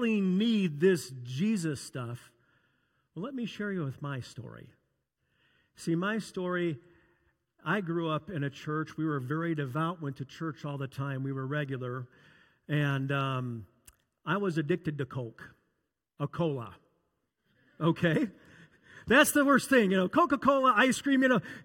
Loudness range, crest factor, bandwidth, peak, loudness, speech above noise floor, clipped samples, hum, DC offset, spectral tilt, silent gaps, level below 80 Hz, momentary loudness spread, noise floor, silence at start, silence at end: 11 LU; 22 dB; 17 kHz; -10 dBFS; -30 LUFS; 52 dB; under 0.1%; none; under 0.1%; -5.5 dB/octave; none; -68 dBFS; 16 LU; -81 dBFS; 0 s; 0 s